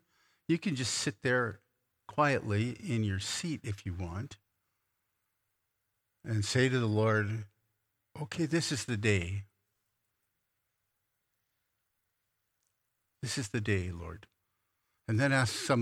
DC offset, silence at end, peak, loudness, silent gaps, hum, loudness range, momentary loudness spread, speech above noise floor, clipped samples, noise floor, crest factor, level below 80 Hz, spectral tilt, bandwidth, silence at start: under 0.1%; 0 s; -14 dBFS; -32 LUFS; none; none; 8 LU; 15 LU; 51 dB; under 0.1%; -83 dBFS; 22 dB; -62 dBFS; -5 dB/octave; 14 kHz; 0.5 s